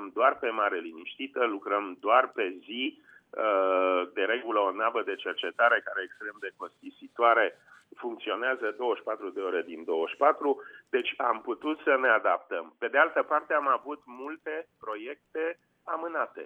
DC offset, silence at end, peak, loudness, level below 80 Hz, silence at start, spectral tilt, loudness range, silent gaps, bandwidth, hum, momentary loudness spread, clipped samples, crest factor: under 0.1%; 0 s; -8 dBFS; -29 LUFS; -84 dBFS; 0 s; -4.5 dB/octave; 3 LU; none; 4.7 kHz; none; 15 LU; under 0.1%; 22 dB